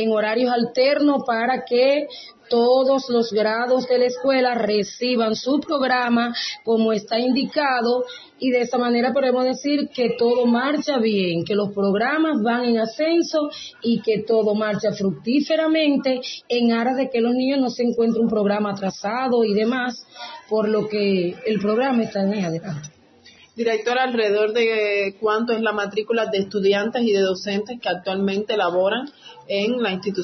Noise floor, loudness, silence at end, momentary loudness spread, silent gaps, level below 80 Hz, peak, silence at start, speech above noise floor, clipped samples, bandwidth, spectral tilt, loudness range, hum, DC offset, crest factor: -50 dBFS; -21 LUFS; 0 s; 6 LU; none; -68 dBFS; -6 dBFS; 0 s; 30 dB; under 0.1%; 6.2 kHz; -5.5 dB/octave; 3 LU; none; under 0.1%; 14 dB